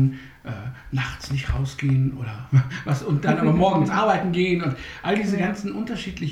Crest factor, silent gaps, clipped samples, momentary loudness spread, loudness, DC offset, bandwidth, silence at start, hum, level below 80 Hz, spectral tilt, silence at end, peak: 16 dB; none; under 0.1%; 11 LU; -23 LUFS; under 0.1%; 10.5 kHz; 0 s; none; -40 dBFS; -7 dB/octave; 0 s; -6 dBFS